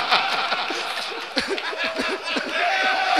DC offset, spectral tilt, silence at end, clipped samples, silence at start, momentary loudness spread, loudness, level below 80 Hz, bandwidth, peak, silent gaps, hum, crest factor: 0.2%; -1 dB/octave; 0 s; under 0.1%; 0 s; 6 LU; -23 LUFS; -62 dBFS; 14 kHz; 0 dBFS; none; none; 24 dB